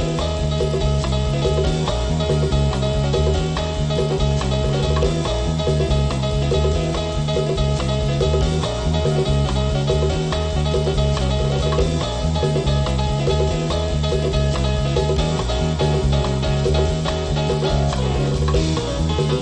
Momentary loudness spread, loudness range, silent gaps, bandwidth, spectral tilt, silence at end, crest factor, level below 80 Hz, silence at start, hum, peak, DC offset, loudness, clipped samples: 2 LU; 0 LU; none; 9.6 kHz; -6 dB/octave; 0 s; 14 dB; -24 dBFS; 0 s; none; -6 dBFS; under 0.1%; -20 LUFS; under 0.1%